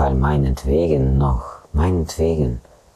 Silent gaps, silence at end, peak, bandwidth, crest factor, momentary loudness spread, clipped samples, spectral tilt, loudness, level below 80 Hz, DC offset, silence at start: none; 0.35 s; -6 dBFS; 13.5 kHz; 12 dB; 8 LU; under 0.1%; -8 dB/octave; -19 LUFS; -24 dBFS; under 0.1%; 0 s